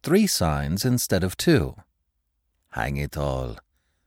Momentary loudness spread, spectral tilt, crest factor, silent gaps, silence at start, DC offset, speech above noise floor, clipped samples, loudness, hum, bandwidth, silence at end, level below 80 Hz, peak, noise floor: 11 LU; -5 dB/octave; 18 dB; none; 0.05 s; under 0.1%; 52 dB; under 0.1%; -24 LUFS; none; 17.5 kHz; 0.45 s; -40 dBFS; -8 dBFS; -75 dBFS